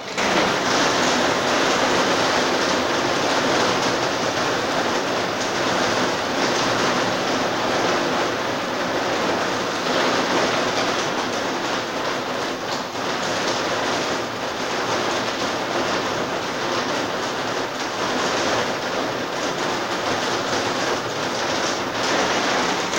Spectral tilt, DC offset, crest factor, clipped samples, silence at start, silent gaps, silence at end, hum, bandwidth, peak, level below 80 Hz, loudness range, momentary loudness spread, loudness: -3 dB/octave; under 0.1%; 16 dB; under 0.1%; 0 s; none; 0 s; none; 16 kHz; -6 dBFS; -54 dBFS; 4 LU; 5 LU; -21 LUFS